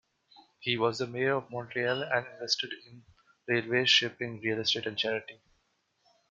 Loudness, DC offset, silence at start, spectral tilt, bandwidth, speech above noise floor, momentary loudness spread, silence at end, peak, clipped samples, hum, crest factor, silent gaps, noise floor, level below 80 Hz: -29 LUFS; under 0.1%; 0.6 s; -3.5 dB/octave; 7.8 kHz; 44 dB; 13 LU; 0.95 s; -10 dBFS; under 0.1%; none; 22 dB; none; -75 dBFS; -76 dBFS